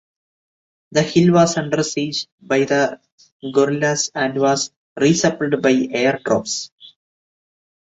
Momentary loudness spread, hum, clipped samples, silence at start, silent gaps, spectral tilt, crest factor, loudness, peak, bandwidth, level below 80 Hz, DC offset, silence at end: 9 LU; none; under 0.1%; 0.9 s; 2.32-2.38 s, 3.12-3.18 s, 3.32-3.40 s, 4.76-4.96 s, 6.72-6.78 s; -4.5 dB/octave; 18 dB; -18 LUFS; -2 dBFS; 8.2 kHz; -58 dBFS; under 0.1%; 0.95 s